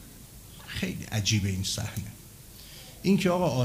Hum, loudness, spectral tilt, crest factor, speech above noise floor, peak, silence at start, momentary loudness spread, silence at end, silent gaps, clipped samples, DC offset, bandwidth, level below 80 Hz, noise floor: none; -28 LUFS; -5 dB/octave; 18 dB; 21 dB; -12 dBFS; 0 s; 22 LU; 0 s; none; under 0.1%; under 0.1%; 16 kHz; -52 dBFS; -48 dBFS